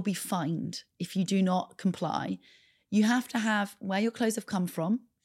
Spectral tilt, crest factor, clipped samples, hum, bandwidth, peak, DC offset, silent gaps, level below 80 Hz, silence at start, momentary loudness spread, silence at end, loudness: -5.5 dB/octave; 14 dB; under 0.1%; none; 16 kHz; -16 dBFS; under 0.1%; none; -78 dBFS; 0 s; 8 LU; 0.25 s; -30 LUFS